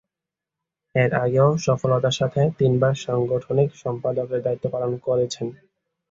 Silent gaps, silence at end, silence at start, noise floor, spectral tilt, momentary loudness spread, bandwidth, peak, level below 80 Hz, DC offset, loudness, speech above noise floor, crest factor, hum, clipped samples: none; 0.55 s; 0.95 s; -87 dBFS; -6.5 dB/octave; 7 LU; 7.8 kHz; -6 dBFS; -56 dBFS; under 0.1%; -22 LUFS; 66 dB; 18 dB; none; under 0.1%